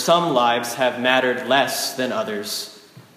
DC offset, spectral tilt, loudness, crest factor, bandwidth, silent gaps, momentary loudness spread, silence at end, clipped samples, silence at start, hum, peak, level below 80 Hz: under 0.1%; -3 dB/octave; -20 LUFS; 18 dB; 15.5 kHz; none; 9 LU; 0.15 s; under 0.1%; 0 s; none; -2 dBFS; -72 dBFS